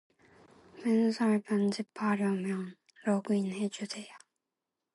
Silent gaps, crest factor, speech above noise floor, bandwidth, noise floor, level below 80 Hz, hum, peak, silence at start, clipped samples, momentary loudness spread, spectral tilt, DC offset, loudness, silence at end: none; 16 dB; 58 dB; 11.5 kHz; -88 dBFS; -80 dBFS; none; -18 dBFS; 0.75 s; under 0.1%; 12 LU; -6.5 dB/octave; under 0.1%; -32 LUFS; 0.8 s